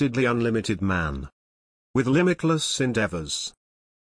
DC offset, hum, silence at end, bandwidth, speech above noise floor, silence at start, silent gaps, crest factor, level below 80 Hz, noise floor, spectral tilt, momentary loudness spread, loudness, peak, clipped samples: under 0.1%; none; 0.6 s; 10.5 kHz; over 66 dB; 0 s; 1.33-1.94 s; 16 dB; -46 dBFS; under -90 dBFS; -5 dB/octave; 10 LU; -24 LUFS; -10 dBFS; under 0.1%